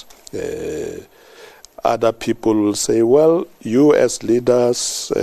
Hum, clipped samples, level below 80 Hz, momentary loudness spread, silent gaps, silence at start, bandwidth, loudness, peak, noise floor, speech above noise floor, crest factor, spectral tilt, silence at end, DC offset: none; under 0.1%; -50 dBFS; 14 LU; none; 0.35 s; 13.5 kHz; -17 LUFS; -2 dBFS; -43 dBFS; 27 dB; 16 dB; -4.5 dB/octave; 0 s; under 0.1%